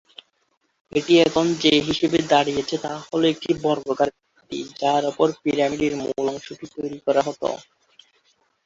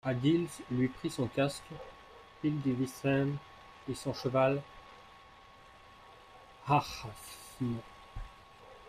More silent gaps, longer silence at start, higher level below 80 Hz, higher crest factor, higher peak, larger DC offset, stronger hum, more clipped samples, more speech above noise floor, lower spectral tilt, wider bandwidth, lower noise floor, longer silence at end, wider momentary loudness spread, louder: neither; first, 0.95 s vs 0.05 s; about the same, -58 dBFS vs -58 dBFS; about the same, 20 dB vs 20 dB; first, -2 dBFS vs -16 dBFS; neither; neither; neither; first, 48 dB vs 24 dB; second, -4.5 dB/octave vs -6.5 dB/octave; second, 7.8 kHz vs 15 kHz; first, -69 dBFS vs -57 dBFS; first, 1.05 s vs 0 s; second, 14 LU vs 25 LU; first, -21 LUFS vs -34 LUFS